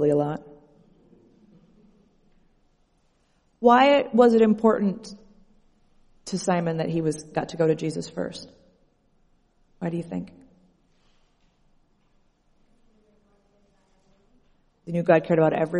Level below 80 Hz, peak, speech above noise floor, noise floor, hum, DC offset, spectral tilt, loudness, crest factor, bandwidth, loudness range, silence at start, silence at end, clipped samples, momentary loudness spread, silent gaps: -60 dBFS; -4 dBFS; 44 dB; -66 dBFS; none; under 0.1%; -6.5 dB/octave; -23 LUFS; 22 dB; 11 kHz; 17 LU; 0 s; 0 s; under 0.1%; 19 LU; none